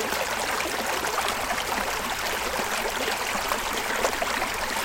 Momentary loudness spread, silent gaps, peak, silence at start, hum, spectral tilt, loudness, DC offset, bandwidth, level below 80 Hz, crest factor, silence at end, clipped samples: 1 LU; none; -8 dBFS; 0 s; none; -1.5 dB/octave; -26 LUFS; under 0.1%; 17 kHz; -46 dBFS; 18 dB; 0 s; under 0.1%